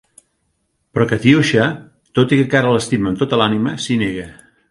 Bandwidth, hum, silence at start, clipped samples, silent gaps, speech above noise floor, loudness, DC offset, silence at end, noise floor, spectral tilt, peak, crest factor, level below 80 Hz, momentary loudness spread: 11.5 kHz; none; 0.95 s; under 0.1%; none; 52 dB; -16 LUFS; under 0.1%; 0.4 s; -67 dBFS; -6 dB/octave; 0 dBFS; 16 dB; -48 dBFS; 11 LU